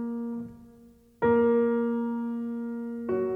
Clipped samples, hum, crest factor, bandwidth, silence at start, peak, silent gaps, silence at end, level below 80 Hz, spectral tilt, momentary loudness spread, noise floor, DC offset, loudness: under 0.1%; none; 16 dB; 3.6 kHz; 0 s; -12 dBFS; none; 0 s; -62 dBFS; -9.5 dB/octave; 12 LU; -55 dBFS; under 0.1%; -28 LUFS